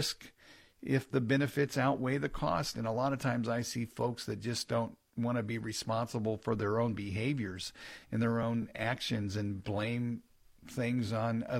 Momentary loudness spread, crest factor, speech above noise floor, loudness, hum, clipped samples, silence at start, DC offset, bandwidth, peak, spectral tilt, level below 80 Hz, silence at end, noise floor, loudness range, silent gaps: 8 LU; 16 dB; 27 dB; -34 LUFS; none; under 0.1%; 0 s; under 0.1%; 16 kHz; -18 dBFS; -5.5 dB/octave; -60 dBFS; 0 s; -60 dBFS; 3 LU; none